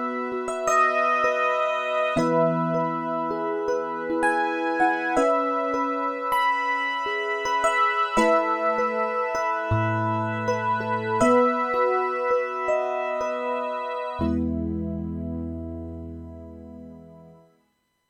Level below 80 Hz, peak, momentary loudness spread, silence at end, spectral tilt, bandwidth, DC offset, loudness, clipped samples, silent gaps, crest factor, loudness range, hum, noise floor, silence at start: -48 dBFS; -6 dBFS; 11 LU; 0.75 s; -5.5 dB/octave; 17 kHz; under 0.1%; -24 LUFS; under 0.1%; none; 18 dB; 7 LU; none; -70 dBFS; 0 s